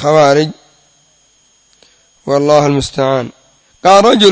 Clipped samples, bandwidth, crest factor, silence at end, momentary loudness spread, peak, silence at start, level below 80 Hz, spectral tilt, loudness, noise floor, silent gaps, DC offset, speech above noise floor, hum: 0.4%; 8 kHz; 12 dB; 0 s; 13 LU; 0 dBFS; 0 s; -44 dBFS; -5 dB/octave; -11 LUFS; -52 dBFS; none; under 0.1%; 43 dB; none